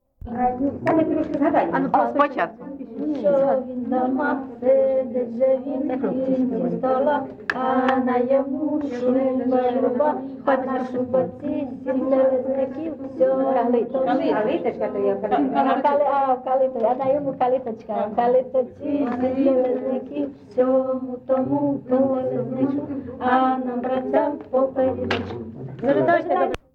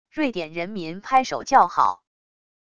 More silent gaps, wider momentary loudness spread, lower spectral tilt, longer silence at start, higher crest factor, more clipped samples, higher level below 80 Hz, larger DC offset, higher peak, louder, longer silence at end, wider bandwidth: neither; second, 7 LU vs 13 LU; first, -8 dB/octave vs -4 dB/octave; about the same, 0.25 s vs 0.15 s; about the same, 16 dB vs 20 dB; neither; about the same, -56 dBFS vs -60 dBFS; second, under 0.1% vs 0.5%; about the same, -6 dBFS vs -4 dBFS; about the same, -22 LUFS vs -22 LUFS; second, 0.15 s vs 0.8 s; second, 6.2 kHz vs 9.2 kHz